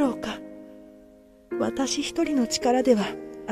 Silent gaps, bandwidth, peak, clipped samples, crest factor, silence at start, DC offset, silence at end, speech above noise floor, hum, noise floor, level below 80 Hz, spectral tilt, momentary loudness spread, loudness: none; 14 kHz; -8 dBFS; under 0.1%; 18 dB; 0 s; under 0.1%; 0 s; 29 dB; none; -52 dBFS; -56 dBFS; -4 dB/octave; 18 LU; -25 LUFS